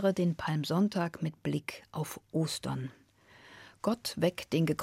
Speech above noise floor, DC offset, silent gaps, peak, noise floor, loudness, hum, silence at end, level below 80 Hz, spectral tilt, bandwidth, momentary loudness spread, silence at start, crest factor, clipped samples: 27 dB; under 0.1%; none; -14 dBFS; -59 dBFS; -33 LUFS; none; 0 s; -66 dBFS; -6 dB/octave; 16 kHz; 11 LU; 0 s; 18 dB; under 0.1%